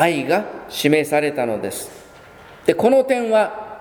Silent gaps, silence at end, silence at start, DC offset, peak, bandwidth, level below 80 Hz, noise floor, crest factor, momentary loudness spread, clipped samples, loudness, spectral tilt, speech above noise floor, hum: none; 0 s; 0 s; under 0.1%; 0 dBFS; 19.5 kHz; -58 dBFS; -43 dBFS; 20 dB; 12 LU; under 0.1%; -19 LUFS; -4.5 dB/octave; 25 dB; none